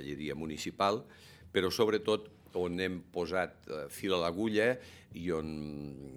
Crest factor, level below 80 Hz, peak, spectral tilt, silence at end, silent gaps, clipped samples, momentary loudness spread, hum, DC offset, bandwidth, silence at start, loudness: 22 dB; -62 dBFS; -14 dBFS; -5 dB/octave; 0 s; none; under 0.1%; 12 LU; none; under 0.1%; 17.5 kHz; 0 s; -34 LUFS